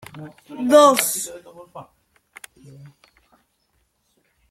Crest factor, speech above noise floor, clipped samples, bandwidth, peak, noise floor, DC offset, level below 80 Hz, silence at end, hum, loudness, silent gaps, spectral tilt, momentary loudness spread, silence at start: 22 dB; 48 dB; under 0.1%; 15.5 kHz; 0 dBFS; -68 dBFS; under 0.1%; -68 dBFS; 2.7 s; none; -16 LUFS; none; -2.5 dB/octave; 29 LU; 0.15 s